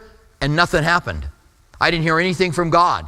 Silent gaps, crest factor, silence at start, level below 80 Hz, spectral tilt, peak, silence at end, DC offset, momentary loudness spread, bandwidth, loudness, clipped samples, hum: none; 18 dB; 0.4 s; -38 dBFS; -5 dB/octave; 0 dBFS; 0 s; under 0.1%; 12 LU; 14.5 kHz; -17 LUFS; under 0.1%; none